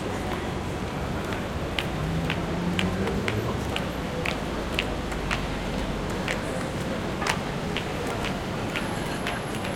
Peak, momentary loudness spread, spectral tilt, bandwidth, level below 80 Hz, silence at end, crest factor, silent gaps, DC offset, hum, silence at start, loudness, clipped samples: -6 dBFS; 3 LU; -5 dB/octave; 17 kHz; -38 dBFS; 0 s; 24 dB; none; under 0.1%; none; 0 s; -29 LUFS; under 0.1%